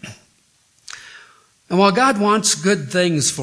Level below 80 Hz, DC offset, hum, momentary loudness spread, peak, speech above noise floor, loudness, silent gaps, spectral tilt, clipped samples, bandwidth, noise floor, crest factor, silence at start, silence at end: -62 dBFS; under 0.1%; none; 22 LU; 0 dBFS; 42 dB; -16 LUFS; none; -3.5 dB/octave; under 0.1%; 11 kHz; -59 dBFS; 20 dB; 0 s; 0 s